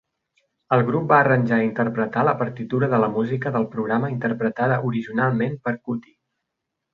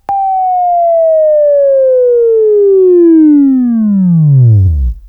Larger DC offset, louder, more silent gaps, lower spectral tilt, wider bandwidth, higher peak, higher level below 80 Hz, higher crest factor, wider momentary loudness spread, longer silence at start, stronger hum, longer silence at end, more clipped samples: neither; second, -22 LUFS vs -8 LUFS; neither; second, -10 dB/octave vs -14 dB/octave; first, 5.2 kHz vs 2.7 kHz; about the same, -2 dBFS vs 0 dBFS; second, -60 dBFS vs -24 dBFS; first, 20 dB vs 6 dB; first, 8 LU vs 5 LU; first, 0.7 s vs 0.1 s; neither; first, 0.95 s vs 0 s; neither